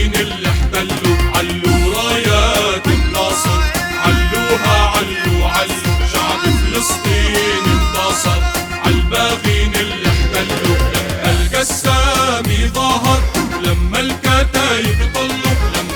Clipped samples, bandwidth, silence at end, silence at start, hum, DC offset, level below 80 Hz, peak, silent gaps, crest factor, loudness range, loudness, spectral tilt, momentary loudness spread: under 0.1%; over 20 kHz; 0 s; 0 s; none; under 0.1%; -20 dBFS; 0 dBFS; none; 14 dB; 1 LU; -14 LUFS; -4 dB/octave; 4 LU